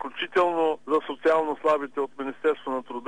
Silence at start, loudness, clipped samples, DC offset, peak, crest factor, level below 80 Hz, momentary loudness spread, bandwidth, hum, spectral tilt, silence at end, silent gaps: 0 s; -26 LUFS; under 0.1%; 0.4%; -12 dBFS; 14 dB; -76 dBFS; 8 LU; 9.8 kHz; none; -5 dB/octave; 0 s; none